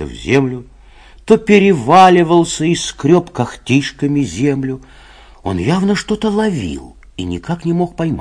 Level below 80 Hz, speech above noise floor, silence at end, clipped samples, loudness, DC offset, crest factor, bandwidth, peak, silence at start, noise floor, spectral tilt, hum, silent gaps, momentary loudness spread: -40 dBFS; 27 dB; 0 s; 0.5%; -14 LUFS; under 0.1%; 14 dB; 11 kHz; 0 dBFS; 0 s; -41 dBFS; -6 dB/octave; none; none; 15 LU